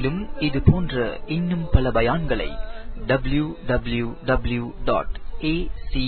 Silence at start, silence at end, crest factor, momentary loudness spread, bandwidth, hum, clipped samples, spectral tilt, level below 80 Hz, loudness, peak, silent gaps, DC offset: 0 s; 0 s; 20 dB; 10 LU; 4.5 kHz; none; under 0.1%; -11.5 dB/octave; -30 dBFS; -24 LUFS; -2 dBFS; none; under 0.1%